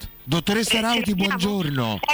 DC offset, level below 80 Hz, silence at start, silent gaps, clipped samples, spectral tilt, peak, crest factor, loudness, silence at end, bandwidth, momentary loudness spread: under 0.1%; -46 dBFS; 0 s; none; under 0.1%; -4 dB/octave; -12 dBFS; 10 dB; -22 LUFS; 0 s; 17 kHz; 5 LU